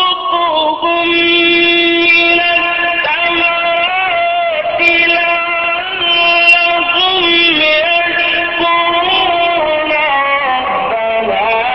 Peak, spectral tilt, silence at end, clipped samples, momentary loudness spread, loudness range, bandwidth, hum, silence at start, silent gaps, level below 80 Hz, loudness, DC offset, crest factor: 0 dBFS; -4 dB/octave; 0 s; under 0.1%; 6 LU; 3 LU; 8 kHz; none; 0 s; none; -46 dBFS; -10 LUFS; under 0.1%; 12 dB